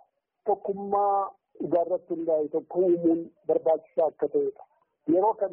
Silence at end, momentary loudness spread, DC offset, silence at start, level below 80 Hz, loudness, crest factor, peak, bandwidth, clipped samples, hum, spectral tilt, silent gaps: 0 s; 7 LU; under 0.1%; 0.45 s; -72 dBFS; -27 LUFS; 14 dB; -14 dBFS; 3.3 kHz; under 0.1%; none; -5.5 dB/octave; none